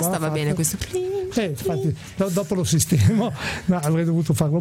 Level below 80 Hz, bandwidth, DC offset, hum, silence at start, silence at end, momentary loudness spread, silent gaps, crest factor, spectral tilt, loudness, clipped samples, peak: -46 dBFS; 16.5 kHz; under 0.1%; none; 0 s; 0 s; 7 LU; none; 14 dB; -5.5 dB/octave; -22 LUFS; under 0.1%; -6 dBFS